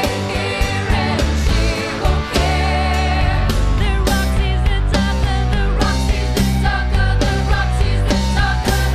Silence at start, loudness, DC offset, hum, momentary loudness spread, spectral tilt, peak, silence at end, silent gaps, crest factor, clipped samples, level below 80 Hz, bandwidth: 0 s; -17 LUFS; under 0.1%; none; 2 LU; -5.5 dB/octave; -2 dBFS; 0 s; none; 12 dB; under 0.1%; -18 dBFS; 15.5 kHz